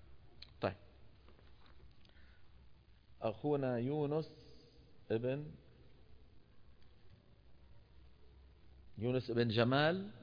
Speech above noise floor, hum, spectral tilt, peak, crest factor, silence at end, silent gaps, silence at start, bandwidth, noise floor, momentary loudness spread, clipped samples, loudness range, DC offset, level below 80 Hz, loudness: 26 dB; none; -5 dB/octave; -20 dBFS; 22 dB; 0 s; none; 0 s; 5.2 kHz; -62 dBFS; 25 LU; under 0.1%; 10 LU; under 0.1%; -66 dBFS; -38 LUFS